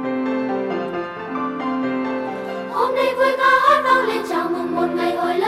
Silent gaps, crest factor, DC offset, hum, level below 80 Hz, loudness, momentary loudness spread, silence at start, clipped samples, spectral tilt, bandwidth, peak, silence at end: none; 16 dB; under 0.1%; none; -60 dBFS; -20 LUFS; 11 LU; 0 s; under 0.1%; -5 dB/octave; 15.5 kHz; -4 dBFS; 0 s